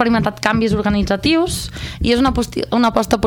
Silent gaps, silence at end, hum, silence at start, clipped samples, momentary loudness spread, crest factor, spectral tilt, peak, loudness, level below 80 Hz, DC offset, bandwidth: none; 0 s; none; 0 s; under 0.1%; 6 LU; 14 dB; -5 dB/octave; -2 dBFS; -17 LUFS; -32 dBFS; under 0.1%; 18 kHz